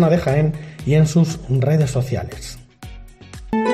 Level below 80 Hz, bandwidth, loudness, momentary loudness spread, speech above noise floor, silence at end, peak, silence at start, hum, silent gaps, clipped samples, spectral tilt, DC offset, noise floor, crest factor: -40 dBFS; 13.5 kHz; -19 LUFS; 23 LU; 20 dB; 0 s; -4 dBFS; 0 s; none; none; under 0.1%; -7 dB/octave; under 0.1%; -37 dBFS; 14 dB